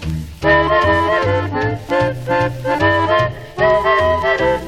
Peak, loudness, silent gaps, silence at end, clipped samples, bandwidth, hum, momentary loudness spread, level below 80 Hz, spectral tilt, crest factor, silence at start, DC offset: -2 dBFS; -15 LUFS; none; 0 s; under 0.1%; 14 kHz; none; 6 LU; -34 dBFS; -6.5 dB/octave; 14 dB; 0 s; under 0.1%